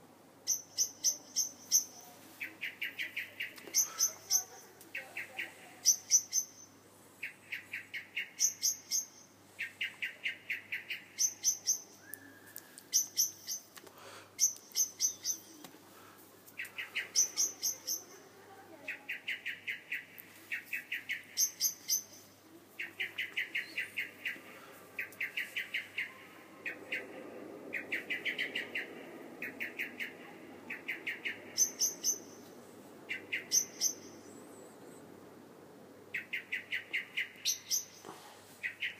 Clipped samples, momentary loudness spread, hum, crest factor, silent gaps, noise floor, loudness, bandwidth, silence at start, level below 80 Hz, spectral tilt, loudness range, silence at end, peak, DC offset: under 0.1%; 23 LU; none; 26 dB; none; -59 dBFS; -35 LUFS; 15.5 kHz; 0 s; under -90 dBFS; 1.5 dB/octave; 6 LU; 0 s; -14 dBFS; under 0.1%